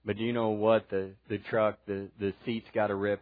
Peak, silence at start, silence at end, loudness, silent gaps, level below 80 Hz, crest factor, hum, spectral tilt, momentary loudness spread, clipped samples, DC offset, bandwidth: -12 dBFS; 0.05 s; 0.05 s; -31 LUFS; none; -68 dBFS; 18 dB; none; -10 dB/octave; 11 LU; under 0.1%; under 0.1%; 5 kHz